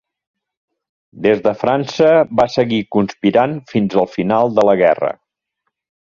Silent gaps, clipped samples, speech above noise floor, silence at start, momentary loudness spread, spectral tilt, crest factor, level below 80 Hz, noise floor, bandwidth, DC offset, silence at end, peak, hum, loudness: none; under 0.1%; 59 dB; 1.15 s; 7 LU; -7 dB/octave; 16 dB; -54 dBFS; -74 dBFS; 7.4 kHz; under 0.1%; 1 s; 0 dBFS; none; -15 LUFS